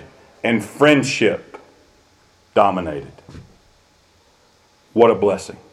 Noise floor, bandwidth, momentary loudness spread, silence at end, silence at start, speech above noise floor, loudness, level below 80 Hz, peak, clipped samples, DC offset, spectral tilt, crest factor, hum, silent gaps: -56 dBFS; 13.5 kHz; 15 LU; 0.2 s; 0.45 s; 39 dB; -18 LUFS; -56 dBFS; 0 dBFS; under 0.1%; under 0.1%; -5 dB/octave; 20 dB; none; none